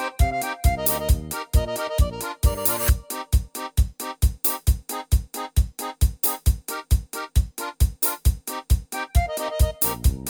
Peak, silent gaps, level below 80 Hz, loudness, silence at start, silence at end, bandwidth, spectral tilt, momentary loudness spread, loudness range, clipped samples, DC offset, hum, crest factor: -4 dBFS; none; -24 dBFS; -24 LUFS; 0 s; 0 s; over 20 kHz; -4.5 dB/octave; 5 LU; 2 LU; under 0.1%; under 0.1%; none; 18 dB